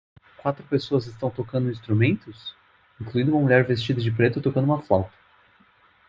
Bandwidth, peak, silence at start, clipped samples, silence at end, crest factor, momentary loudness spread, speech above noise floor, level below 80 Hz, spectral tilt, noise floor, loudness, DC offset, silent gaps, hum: 7.4 kHz; -4 dBFS; 0.45 s; under 0.1%; 1 s; 20 dB; 13 LU; 36 dB; -58 dBFS; -8.5 dB/octave; -58 dBFS; -23 LUFS; under 0.1%; none; none